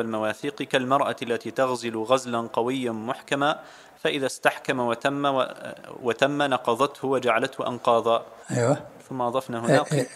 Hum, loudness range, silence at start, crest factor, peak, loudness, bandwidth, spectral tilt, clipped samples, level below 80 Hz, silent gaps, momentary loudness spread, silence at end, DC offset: none; 2 LU; 0 s; 22 dB; -2 dBFS; -25 LUFS; 15.5 kHz; -5 dB/octave; under 0.1%; -70 dBFS; none; 7 LU; 0 s; under 0.1%